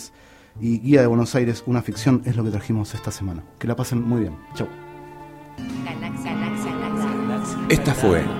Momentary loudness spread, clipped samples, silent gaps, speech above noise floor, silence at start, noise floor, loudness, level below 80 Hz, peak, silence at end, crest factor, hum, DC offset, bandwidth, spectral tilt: 15 LU; under 0.1%; none; 28 dB; 0 s; -48 dBFS; -23 LUFS; -44 dBFS; -2 dBFS; 0 s; 20 dB; none; under 0.1%; 16 kHz; -6.5 dB/octave